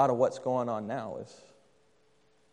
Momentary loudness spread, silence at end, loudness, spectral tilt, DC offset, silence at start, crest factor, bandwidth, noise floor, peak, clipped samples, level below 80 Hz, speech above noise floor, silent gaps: 16 LU; 1.2 s; -32 LUFS; -7 dB/octave; under 0.1%; 0 s; 20 dB; 10 kHz; -68 dBFS; -12 dBFS; under 0.1%; -78 dBFS; 38 dB; none